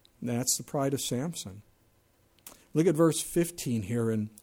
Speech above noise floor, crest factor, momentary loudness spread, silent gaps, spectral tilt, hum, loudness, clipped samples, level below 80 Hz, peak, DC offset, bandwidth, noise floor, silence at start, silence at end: 37 dB; 18 dB; 9 LU; none; -5 dB/octave; none; -29 LUFS; under 0.1%; -62 dBFS; -12 dBFS; under 0.1%; 17.5 kHz; -66 dBFS; 0.2 s; 0.15 s